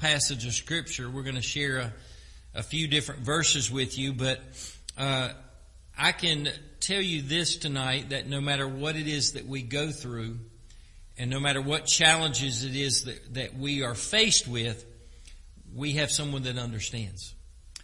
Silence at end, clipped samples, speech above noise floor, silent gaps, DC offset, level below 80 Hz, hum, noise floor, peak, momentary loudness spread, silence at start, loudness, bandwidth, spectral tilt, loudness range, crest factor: 0 s; under 0.1%; 22 dB; none; under 0.1%; -50 dBFS; none; -50 dBFS; -6 dBFS; 14 LU; 0 s; -27 LUFS; 11.5 kHz; -2.5 dB/octave; 5 LU; 24 dB